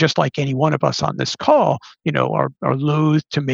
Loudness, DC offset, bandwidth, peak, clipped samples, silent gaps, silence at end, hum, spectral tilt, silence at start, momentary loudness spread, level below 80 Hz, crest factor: -18 LUFS; under 0.1%; 7.6 kHz; -2 dBFS; under 0.1%; none; 0 s; none; -6 dB/octave; 0 s; 6 LU; -58 dBFS; 16 dB